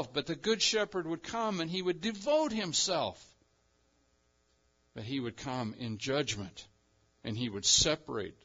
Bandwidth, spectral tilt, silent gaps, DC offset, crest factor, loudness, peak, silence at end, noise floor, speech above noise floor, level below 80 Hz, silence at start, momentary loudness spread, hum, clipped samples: 7.8 kHz; -3 dB/octave; none; under 0.1%; 22 dB; -32 LUFS; -12 dBFS; 0.1 s; -73 dBFS; 39 dB; -60 dBFS; 0 s; 14 LU; none; under 0.1%